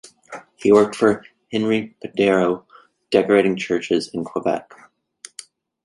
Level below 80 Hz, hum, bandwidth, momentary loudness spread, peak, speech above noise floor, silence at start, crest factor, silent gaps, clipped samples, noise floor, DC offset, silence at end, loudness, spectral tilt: -60 dBFS; none; 11.5 kHz; 22 LU; -2 dBFS; 27 dB; 0.3 s; 20 dB; none; under 0.1%; -46 dBFS; under 0.1%; 1.25 s; -20 LUFS; -5.5 dB/octave